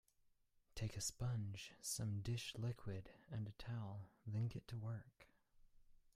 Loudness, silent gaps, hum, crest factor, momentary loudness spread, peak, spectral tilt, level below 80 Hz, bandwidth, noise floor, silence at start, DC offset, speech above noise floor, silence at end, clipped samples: -48 LUFS; none; none; 16 dB; 9 LU; -32 dBFS; -4.5 dB/octave; -66 dBFS; 15.5 kHz; -78 dBFS; 0.75 s; under 0.1%; 31 dB; 0.2 s; under 0.1%